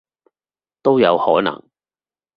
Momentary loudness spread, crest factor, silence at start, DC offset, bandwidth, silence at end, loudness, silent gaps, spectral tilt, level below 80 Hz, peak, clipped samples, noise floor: 10 LU; 18 dB; 0.85 s; under 0.1%; 5.2 kHz; 0.8 s; -16 LUFS; none; -8.5 dB/octave; -60 dBFS; -2 dBFS; under 0.1%; under -90 dBFS